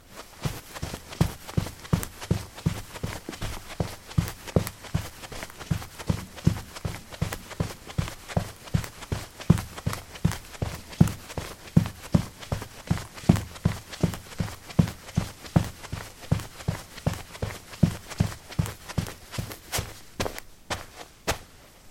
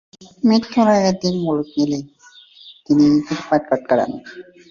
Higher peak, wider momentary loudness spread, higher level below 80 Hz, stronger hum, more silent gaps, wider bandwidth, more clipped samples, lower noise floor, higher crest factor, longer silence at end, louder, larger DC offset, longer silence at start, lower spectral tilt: about the same, -2 dBFS vs -2 dBFS; about the same, 11 LU vs 9 LU; first, -42 dBFS vs -56 dBFS; neither; neither; first, 16.5 kHz vs 7.4 kHz; neither; about the same, -49 dBFS vs -46 dBFS; first, 28 dB vs 16 dB; second, 0 s vs 0.3 s; second, -30 LUFS vs -18 LUFS; neither; second, 0.05 s vs 0.2 s; about the same, -6 dB/octave vs -6 dB/octave